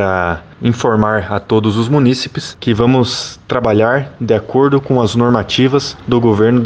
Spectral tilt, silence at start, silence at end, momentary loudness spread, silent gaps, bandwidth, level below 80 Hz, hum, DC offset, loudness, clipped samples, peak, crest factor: -6.5 dB/octave; 0 s; 0 s; 6 LU; none; 9.2 kHz; -42 dBFS; none; under 0.1%; -14 LUFS; under 0.1%; 0 dBFS; 12 dB